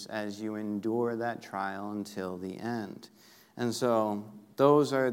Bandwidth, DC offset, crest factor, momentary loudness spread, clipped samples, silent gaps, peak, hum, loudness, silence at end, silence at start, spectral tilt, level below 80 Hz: 16 kHz; under 0.1%; 20 dB; 14 LU; under 0.1%; none; -10 dBFS; none; -31 LUFS; 0 s; 0 s; -6 dB/octave; -82 dBFS